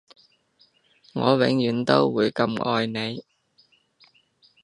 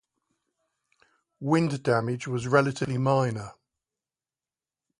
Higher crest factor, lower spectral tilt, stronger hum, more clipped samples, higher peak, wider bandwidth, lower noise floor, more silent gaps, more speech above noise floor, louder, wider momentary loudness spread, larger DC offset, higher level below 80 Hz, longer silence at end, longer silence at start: about the same, 24 dB vs 22 dB; about the same, -6.5 dB/octave vs -7 dB/octave; neither; neither; first, -2 dBFS vs -6 dBFS; about the same, 10.5 kHz vs 11.5 kHz; second, -62 dBFS vs under -90 dBFS; neither; second, 40 dB vs over 65 dB; first, -23 LUFS vs -26 LUFS; about the same, 11 LU vs 11 LU; neither; about the same, -66 dBFS vs -64 dBFS; about the same, 1.4 s vs 1.45 s; second, 1.15 s vs 1.4 s